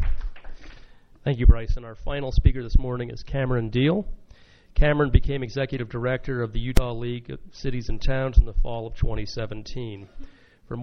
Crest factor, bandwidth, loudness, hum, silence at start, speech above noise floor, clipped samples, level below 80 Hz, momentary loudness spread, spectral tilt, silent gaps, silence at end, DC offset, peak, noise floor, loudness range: 22 dB; 9 kHz; -26 LUFS; none; 0 s; 25 dB; under 0.1%; -26 dBFS; 14 LU; -7.5 dB/octave; none; 0 s; under 0.1%; -2 dBFS; -47 dBFS; 4 LU